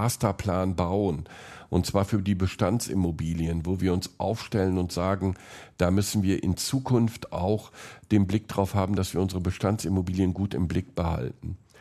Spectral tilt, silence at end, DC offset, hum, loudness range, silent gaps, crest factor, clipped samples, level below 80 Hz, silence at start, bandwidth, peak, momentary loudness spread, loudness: -6.5 dB/octave; 0.25 s; under 0.1%; none; 1 LU; none; 20 dB; under 0.1%; -50 dBFS; 0 s; 13.5 kHz; -8 dBFS; 6 LU; -27 LUFS